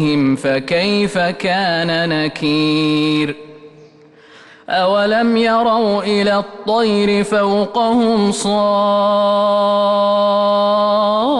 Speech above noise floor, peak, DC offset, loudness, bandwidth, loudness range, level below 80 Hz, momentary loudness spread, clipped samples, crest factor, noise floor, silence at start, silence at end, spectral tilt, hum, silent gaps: 30 dB; -6 dBFS; under 0.1%; -15 LUFS; 11.5 kHz; 4 LU; -54 dBFS; 3 LU; under 0.1%; 10 dB; -44 dBFS; 0 s; 0 s; -5.5 dB/octave; none; none